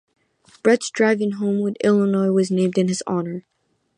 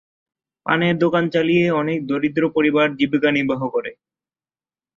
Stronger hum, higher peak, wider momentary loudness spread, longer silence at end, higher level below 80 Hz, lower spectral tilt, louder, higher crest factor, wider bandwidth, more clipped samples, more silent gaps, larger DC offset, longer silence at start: neither; about the same, -2 dBFS vs -2 dBFS; about the same, 7 LU vs 7 LU; second, 0.6 s vs 1.05 s; second, -68 dBFS vs -60 dBFS; second, -6 dB/octave vs -7.5 dB/octave; about the same, -20 LUFS vs -19 LUFS; about the same, 18 dB vs 18 dB; first, 10.5 kHz vs 7.2 kHz; neither; neither; neither; about the same, 0.65 s vs 0.65 s